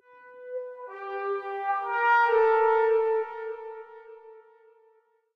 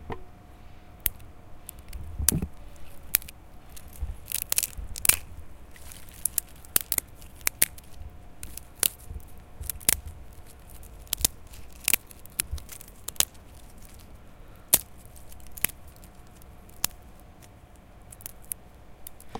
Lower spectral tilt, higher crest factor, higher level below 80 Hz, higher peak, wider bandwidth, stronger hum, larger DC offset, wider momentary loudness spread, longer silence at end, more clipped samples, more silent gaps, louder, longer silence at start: first, -3 dB/octave vs -1 dB/octave; second, 16 dB vs 34 dB; second, -74 dBFS vs -44 dBFS; second, -12 dBFS vs 0 dBFS; second, 6 kHz vs 17 kHz; neither; neither; second, 19 LU vs 25 LU; first, 0.95 s vs 0 s; neither; neither; about the same, -25 LUFS vs -27 LUFS; first, 0.25 s vs 0 s